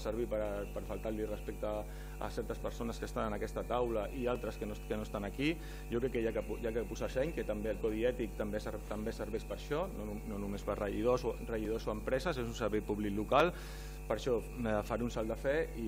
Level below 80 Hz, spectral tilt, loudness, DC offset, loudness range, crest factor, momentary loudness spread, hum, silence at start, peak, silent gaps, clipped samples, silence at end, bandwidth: -46 dBFS; -6 dB/octave; -38 LUFS; under 0.1%; 4 LU; 22 dB; 7 LU; none; 0 s; -14 dBFS; none; under 0.1%; 0 s; 16 kHz